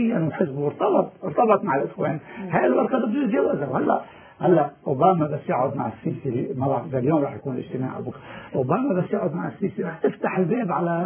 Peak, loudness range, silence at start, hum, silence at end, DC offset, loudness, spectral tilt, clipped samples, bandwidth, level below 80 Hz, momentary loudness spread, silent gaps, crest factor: -4 dBFS; 4 LU; 0 s; none; 0 s; under 0.1%; -23 LUFS; -12 dB/octave; under 0.1%; 3.5 kHz; -62 dBFS; 9 LU; none; 18 dB